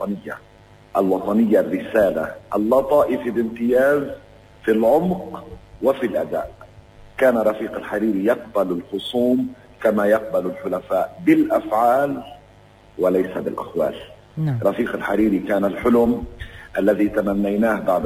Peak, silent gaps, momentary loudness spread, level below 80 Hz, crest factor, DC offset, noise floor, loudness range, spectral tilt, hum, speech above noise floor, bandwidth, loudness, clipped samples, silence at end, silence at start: -4 dBFS; none; 12 LU; -48 dBFS; 16 dB; under 0.1%; -48 dBFS; 3 LU; -7.5 dB/octave; none; 29 dB; 16 kHz; -20 LUFS; under 0.1%; 0 s; 0 s